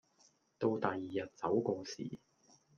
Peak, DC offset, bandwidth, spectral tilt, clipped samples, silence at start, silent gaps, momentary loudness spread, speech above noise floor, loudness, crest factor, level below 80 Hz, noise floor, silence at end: -16 dBFS; under 0.1%; 7.2 kHz; -6 dB/octave; under 0.1%; 0.6 s; none; 11 LU; 34 dB; -38 LUFS; 24 dB; -80 dBFS; -71 dBFS; 0.6 s